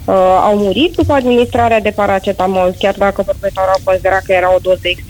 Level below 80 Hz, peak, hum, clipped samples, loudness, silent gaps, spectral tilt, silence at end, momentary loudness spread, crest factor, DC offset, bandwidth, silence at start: -34 dBFS; 0 dBFS; none; under 0.1%; -12 LUFS; none; -5.5 dB/octave; 0 s; 4 LU; 12 dB; under 0.1%; 19.5 kHz; 0 s